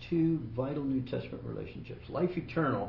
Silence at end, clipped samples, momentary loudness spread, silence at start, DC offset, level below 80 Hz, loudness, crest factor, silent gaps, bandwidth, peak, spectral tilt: 0 s; under 0.1%; 11 LU; 0 s; under 0.1%; -56 dBFS; -34 LUFS; 16 dB; none; 6 kHz; -18 dBFS; -10 dB/octave